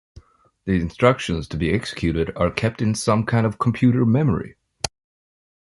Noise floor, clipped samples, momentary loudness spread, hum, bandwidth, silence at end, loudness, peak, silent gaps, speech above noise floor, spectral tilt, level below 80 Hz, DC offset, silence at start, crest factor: -49 dBFS; under 0.1%; 12 LU; none; 11.5 kHz; 0.9 s; -21 LUFS; -2 dBFS; none; 29 dB; -6.5 dB/octave; -40 dBFS; under 0.1%; 0.65 s; 20 dB